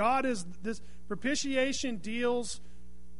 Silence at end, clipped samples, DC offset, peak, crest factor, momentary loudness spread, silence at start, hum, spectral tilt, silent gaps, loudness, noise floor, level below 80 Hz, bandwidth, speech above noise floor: 0 s; under 0.1%; 1%; -16 dBFS; 18 dB; 12 LU; 0 s; none; -3.5 dB/octave; none; -33 LUFS; -54 dBFS; -56 dBFS; 11 kHz; 22 dB